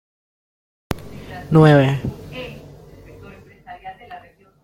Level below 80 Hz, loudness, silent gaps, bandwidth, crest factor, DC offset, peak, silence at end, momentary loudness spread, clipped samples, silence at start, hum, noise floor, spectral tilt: -46 dBFS; -17 LUFS; none; 13 kHz; 20 dB; under 0.1%; -2 dBFS; 0.45 s; 28 LU; under 0.1%; 0.9 s; none; -43 dBFS; -8 dB/octave